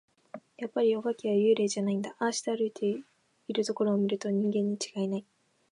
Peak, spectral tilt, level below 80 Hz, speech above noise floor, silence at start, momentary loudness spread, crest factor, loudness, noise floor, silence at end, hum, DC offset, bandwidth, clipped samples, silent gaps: -14 dBFS; -5.5 dB/octave; -82 dBFS; 21 dB; 0.35 s; 13 LU; 16 dB; -30 LUFS; -50 dBFS; 0.5 s; none; under 0.1%; 11 kHz; under 0.1%; none